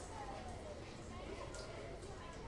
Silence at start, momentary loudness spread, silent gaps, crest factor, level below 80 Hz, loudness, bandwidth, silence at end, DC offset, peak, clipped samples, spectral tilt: 0 s; 2 LU; none; 14 dB; -56 dBFS; -50 LUFS; 11.5 kHz; 0 s; under 0.1%; -34 dBFS; under 0.1%; -5 dB/octave